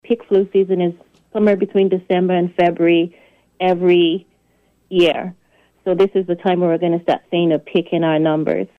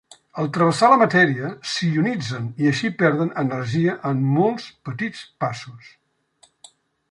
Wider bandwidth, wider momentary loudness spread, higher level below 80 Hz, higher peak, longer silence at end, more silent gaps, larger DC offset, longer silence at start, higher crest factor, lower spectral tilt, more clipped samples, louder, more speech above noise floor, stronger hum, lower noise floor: second, 6.2 kHz vs 11.5 kHz; second, 7 LU vs 14 LU; about the same, -60 dBFS vs -62 dBFS; second, -6 dBFS vs -2 dBFS; second, 0.15 s vs 1.25 s; neither; neither; second, 0.1 s vs 0.35 s; second, 12 dB vs 20 dB; first, -8 dB/octave vs -6 dB/octave; neither; first, -17 LUFS vs -20 LUFS; first, 44 dB vs 38 dB; neither; about the same, -60 dBFS vs -59 dBFS